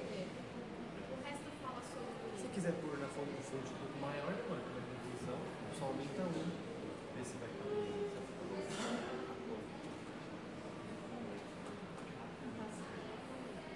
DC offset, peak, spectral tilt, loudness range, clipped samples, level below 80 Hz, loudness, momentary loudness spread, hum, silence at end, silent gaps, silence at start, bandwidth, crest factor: under 0.1%; -26 dBFS; -5.5 dB/octave; 5 LU; under 0.1%; -70 dBFS; -45 LUFS; 7 LU; none; 0 s; none; 0 s; 11.5 kHz; 20 dB